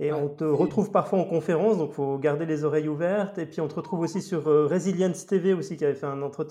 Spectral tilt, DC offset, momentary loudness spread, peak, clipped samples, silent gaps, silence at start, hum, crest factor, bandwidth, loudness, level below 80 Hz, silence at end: -7.5 dB/octave; under 0.1%; 7 LU; -8 dBFS; under 0.1%; none; 0 s; none; 16 dB; 12 kHz; -26 LUFS; -70 dBFS; 0 s